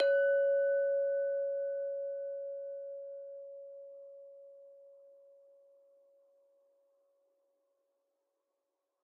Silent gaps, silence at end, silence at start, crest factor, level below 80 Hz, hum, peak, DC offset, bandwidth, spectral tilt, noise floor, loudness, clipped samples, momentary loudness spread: none; 4.1 s; 0 s; 18 dB; under -90 dBFS; none; -20 dBFS; under 0.1%; 3 kHz; 9.5 dB/octave; -86 dBFS; -34 LUFS; under 0.1%; 24 LU